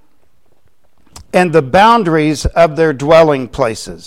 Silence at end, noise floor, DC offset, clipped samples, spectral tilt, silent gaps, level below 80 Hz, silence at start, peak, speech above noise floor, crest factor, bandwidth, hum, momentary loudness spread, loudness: 0.1 s; -59 dBFS; 0.7%; under 0.1%; -5.5 dB/octave; none; -30 dBFS; 1.2 s; 0 dBFS; 48 dB; 12 dB; 15 kHz; none; 8 LU; -11 LUFS